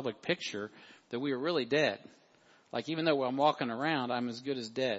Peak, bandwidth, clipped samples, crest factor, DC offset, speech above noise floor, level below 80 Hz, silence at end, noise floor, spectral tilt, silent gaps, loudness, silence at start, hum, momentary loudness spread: -14 dBFS; 8 kHz; under 0.1%; 20 dB; under 0.1%; 31 dB; -82 dBFS; 0 s; -64 dBFS; -5 dB/octave; none; -33 LUFS; 0 s; none; 11 LU